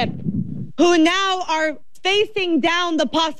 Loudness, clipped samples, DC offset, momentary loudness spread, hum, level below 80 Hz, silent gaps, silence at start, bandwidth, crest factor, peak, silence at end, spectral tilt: -19 LUFS; under 0.1%; 2%; 10 LU; none; -52 dBFS; none; 0 s; 11.5 kHz; 14 dB; -6 dBFS; 0.05 s; -4 dB/octave